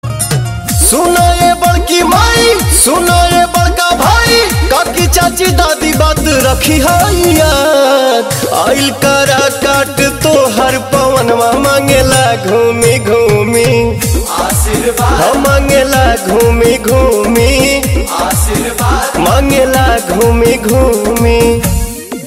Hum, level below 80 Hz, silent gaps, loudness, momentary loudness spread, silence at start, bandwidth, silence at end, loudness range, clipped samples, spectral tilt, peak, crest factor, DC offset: none; -18 dBFS; none; -9 LUFS; 4 LU; 0.05 s; 16.5 kHz; 0 s; 2 LU; 0.1%; -4 dB/octave; 0 dBFS; 8 dB; under 0.1%